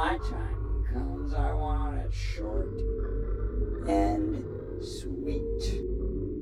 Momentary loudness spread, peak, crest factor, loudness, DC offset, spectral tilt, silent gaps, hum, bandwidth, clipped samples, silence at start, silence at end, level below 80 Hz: 7 LU; -14 dBFS; 16 dB; -32 LUFS; under 0.1%; -7 dB/octave; none; none; 11 kHz; under 0.1%; 0 s; 0 s; -32 dBFS